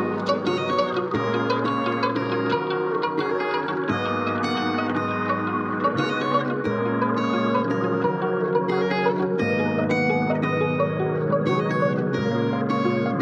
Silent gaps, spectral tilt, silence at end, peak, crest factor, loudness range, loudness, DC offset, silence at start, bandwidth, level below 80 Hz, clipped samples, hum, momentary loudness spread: none; -7 dB/octave; 0 s; -8 dBFS; 16 dB; 2 LU; -23 LUFS; under 0.1%; 0 s; 8.6 kHz; -64 dBFS; under 0.1%; none; 2 LU